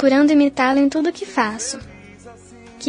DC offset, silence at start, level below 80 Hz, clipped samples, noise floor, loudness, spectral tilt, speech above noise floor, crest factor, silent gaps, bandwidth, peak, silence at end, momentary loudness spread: under 0.1%; 0 s; -52 dBFS; under 0.1%; -42 dBFS; -18 LUFS; -3.5 dB/octave; 25 dB; 16 dB; none; 10 kHz; -2 dBFS; 0 s; 12 LU